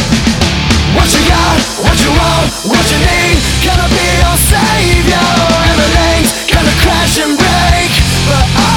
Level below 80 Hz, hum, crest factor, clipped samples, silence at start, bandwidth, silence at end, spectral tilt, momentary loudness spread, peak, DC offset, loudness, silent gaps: -16 dBFS; none; 8 dB; 0.3%; 0 s; 19 kHz; 0 s; -4 dB/octave; 2 LU; 0 dBFS; under 0.1%; -9 LUFS; none